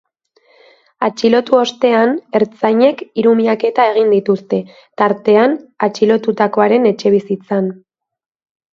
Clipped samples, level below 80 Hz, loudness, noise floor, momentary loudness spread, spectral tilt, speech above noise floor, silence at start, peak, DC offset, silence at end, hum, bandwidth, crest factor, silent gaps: under 0.1%; -64 dBFS; -14 LUFS; -55 dBFS; 7 LU; -6 dB/octave; 42 dB; 1 s; 0 dBFS; under 0.1%; 1 s; none; 7.4 kHz; 14 dB; none